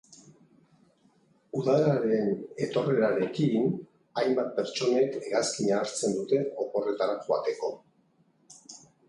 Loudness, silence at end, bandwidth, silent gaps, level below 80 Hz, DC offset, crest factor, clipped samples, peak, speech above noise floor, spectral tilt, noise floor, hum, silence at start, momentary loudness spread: -28 LUFS; 0.3 s; 11.5 kHz; none; -72 dBFS; under 0.1%; 16 dB; under 0.1%; -12 dBFS; 40 dB; -5.5 dB/octave; -67 dBFS; none; 0.1 s; 11 LU